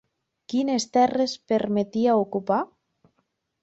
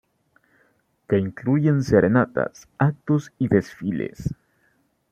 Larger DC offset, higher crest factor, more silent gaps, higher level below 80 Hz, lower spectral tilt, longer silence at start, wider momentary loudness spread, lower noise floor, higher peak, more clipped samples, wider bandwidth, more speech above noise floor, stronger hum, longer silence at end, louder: neither; about the same, 16 dB vs 20 dB; neither; second, -66 dBFS vs -50 dBFS; second, -5 dB/octave vs -8.5 dB/octave; second, 0.5 s vs 1.1 s; second, 6 LU vs 11 LU; first, -74 dBFS vs -66 dBFS; second, -8 dBFS vs -4 dBFS; neither; about the same, 8.2 kHz vs 8.4 kHz; first, 51 dB vs 44 dB; neither; first, 1 s vs 0.8 s; about the same, -24 LUFS vs -22 LUFS